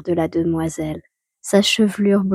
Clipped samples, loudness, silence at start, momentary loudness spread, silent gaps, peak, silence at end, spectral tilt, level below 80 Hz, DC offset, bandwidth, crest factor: under 0.1%; -19 LUFS; 0.05 s; 14 LU; none; -2 dBFS; 0 s; -5 dB/octave; -50 dBFS; under 0.1%; 15 kHz; 16 dB